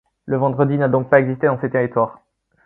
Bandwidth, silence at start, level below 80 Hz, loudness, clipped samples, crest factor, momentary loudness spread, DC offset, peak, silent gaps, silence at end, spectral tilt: 4 kHz; 0.25 s; -58 dBFS; -18 LUFS; under 0.1%; 18 dB; 7 LU; under 0.1%; 0 dBFS; none; 0.55 s; -11.5 dB/octave